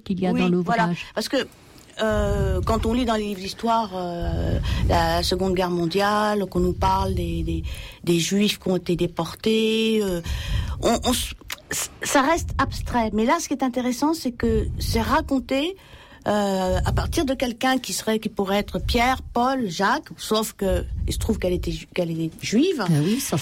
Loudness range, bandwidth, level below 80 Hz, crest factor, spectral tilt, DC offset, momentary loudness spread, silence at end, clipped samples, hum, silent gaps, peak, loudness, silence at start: 2 LU; 16.5 kHz; -34 dBFS; 12 dB; -5 dB/octave; under 0.1%; 7 LU; 0 s; under 0.1%; none; none; -10 dBFS; -23 LUFS; 0.05 s